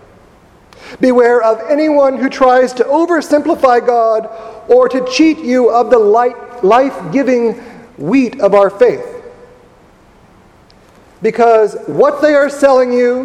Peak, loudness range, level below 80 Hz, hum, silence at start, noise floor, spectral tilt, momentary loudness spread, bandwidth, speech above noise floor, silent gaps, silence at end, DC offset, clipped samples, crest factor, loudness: 0 dBFS; 5 LU; -52 dBFS; none; 0.85 s; -44 dBFS; -5.5 dB/octave; 8 LU; 11.5 kHz; 34 dB; none; 0 s; under 0.1%; 0.2%; 12 dB; -11 LUFS